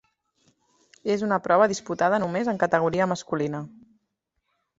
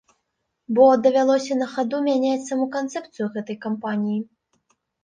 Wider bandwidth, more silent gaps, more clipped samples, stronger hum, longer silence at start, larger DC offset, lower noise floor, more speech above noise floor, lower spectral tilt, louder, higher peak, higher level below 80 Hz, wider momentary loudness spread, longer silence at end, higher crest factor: second, 8 kHz vs 9.4 kHz; neither; neither; neither; first, 1.05 s vs 0.7 s; neither; about the same, -78 dBFS vs -76 dBFS; about the same, 54 dB vs 56 dB; about the same, -5.5 dB/octave vs -5.5 dB/octave; about the same, -24 LUFS vs -22 LUFS; about the same, -6 dBFS vs -4 dBFS; first, -64 dBFS vs -70 dBFS; second, 10 LU vs 13 LU; first, 1.1 s vs 0.8 s; about the same, 20 dB vs 18 dB